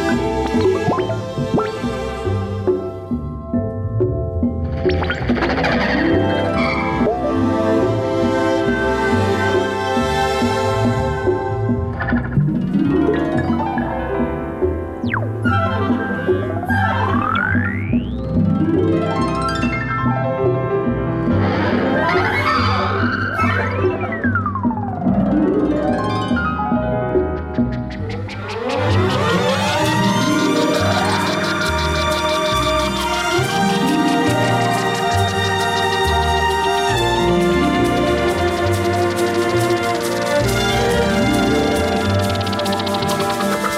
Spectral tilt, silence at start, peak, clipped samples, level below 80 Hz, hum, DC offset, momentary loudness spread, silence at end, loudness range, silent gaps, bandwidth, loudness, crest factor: -5.5 dB/octave; 0 s; -8 dBFS; under 0.1%; -34 dBFS; none; under 0.1%; 5 LU; 0 s; 3 LU; none; 16 kHz; -18 LUFS; 10 dB